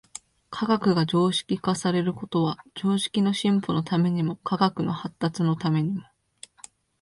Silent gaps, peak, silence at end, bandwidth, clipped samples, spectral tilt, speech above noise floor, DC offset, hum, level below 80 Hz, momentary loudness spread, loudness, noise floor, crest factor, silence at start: none; -6 dBFS; 1 s; 11.5 kHz; under 0.1%; -6 dB/octave; 27 dB; under 0.1%; none; -62 dBFS; 9 LU; -25 LUFS; -51 dBFS; 18 dB; 0.5 s